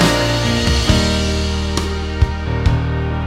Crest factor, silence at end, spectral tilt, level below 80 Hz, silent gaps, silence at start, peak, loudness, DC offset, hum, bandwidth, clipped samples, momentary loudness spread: 16 dB; 0 s; -5 dB/octave; -22 dBFS; none; 0 s; 0 dBFS; -17 LUFS; under 0.1%; none; 15.5 kHz; under 0.1%; 6 LU